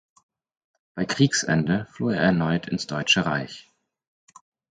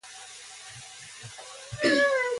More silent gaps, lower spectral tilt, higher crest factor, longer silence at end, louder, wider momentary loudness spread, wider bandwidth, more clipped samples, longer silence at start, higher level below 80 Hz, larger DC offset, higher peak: neither; first, -4.5 dB/octave vs -3 dB/octave; about the same, 20 dB vs 18 dB; first, 1.15 s vs 0 s; about the same, -23 LUFS vs -24 LUFS; second, 12 LU vs 20 LU; second, 9.4 kHz vs 11.5 kHz; neither; first, 0.95 s vs 0.05 s; first, -56 dBFS vs -64 dBFS; neither; first, -6 dBFS vs -12 dBFS